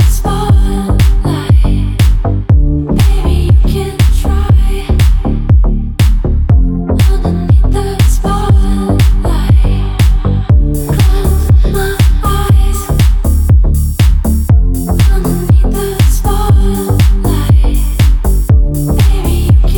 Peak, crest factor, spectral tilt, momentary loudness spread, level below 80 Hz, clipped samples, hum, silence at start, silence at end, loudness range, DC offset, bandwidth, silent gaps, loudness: 0 dBFS; 8 dB; -6.5 dB/octave; 4 LU; -10 dBFS; under 0.1%; none; 0 s; 0 s; 1 LU; under 0.1%; 19.5 kHz; none; -11 LUFS